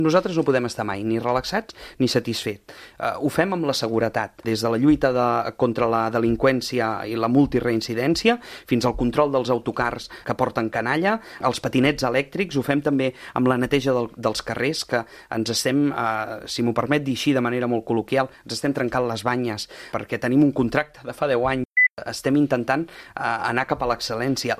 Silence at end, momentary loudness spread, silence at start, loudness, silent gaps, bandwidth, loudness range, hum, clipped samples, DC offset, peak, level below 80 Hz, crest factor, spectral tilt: 0 s; 8 LU; 0 s; -22 LUFS; 21.65-21.72 s, 21.90-21.96 s; 15.5 kHz; 3 LU; none; under 0.1%; under 0.1%; -4 dBFS; -48 dBFS; 20 dB; -5.5 dB/octave